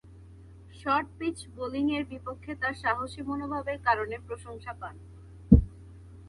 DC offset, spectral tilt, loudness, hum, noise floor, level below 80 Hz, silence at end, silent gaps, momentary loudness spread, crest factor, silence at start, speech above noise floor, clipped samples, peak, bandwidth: under 0.1%; -7.5 dB/octave; -29 LUFS; none; -50 dBFS; -38 dBFS; 0 s; none; 21 LU; 28 dB; 0.05 s; 18 dB; under 0.1%; -2 dBFS; 11.5 kHz